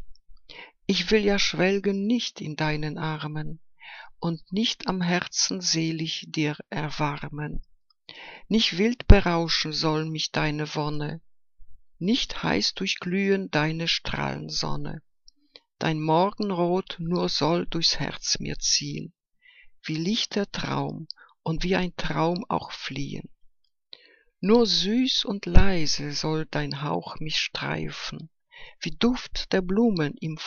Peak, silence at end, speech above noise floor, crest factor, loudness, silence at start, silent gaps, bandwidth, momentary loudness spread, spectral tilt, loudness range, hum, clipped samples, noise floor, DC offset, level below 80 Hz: 0 dBFS; 0 s; 32 dB; 24 dB; -26 LUFS; 0 s; none; 7.2 kHz; 13 LU; -4.5 dB/octave; 5 LU; none; under 0.1%; -57 dBFS; under 0.1%; -34 dBFS